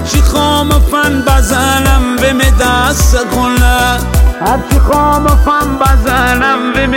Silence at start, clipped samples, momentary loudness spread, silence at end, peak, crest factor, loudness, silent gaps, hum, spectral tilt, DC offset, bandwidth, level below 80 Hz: 0 s; under 0.1%; 2 LU; 0 s; 0 dBFS; 8 dB; -10 LUFS; none; none; -4.5 dB/octave; under 0.1%; 17 kHz; -12 dBFS